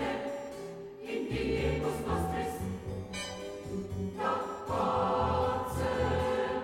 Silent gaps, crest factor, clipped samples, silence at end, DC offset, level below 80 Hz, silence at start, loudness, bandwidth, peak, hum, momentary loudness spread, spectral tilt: none; 16 dB; under 0.1%; 0 s; under 0.1%; -46 dBFS; 0 s; -33 LUFS; 16 kHz; -18 dBFS; none; 10 LU; -6 dB/octave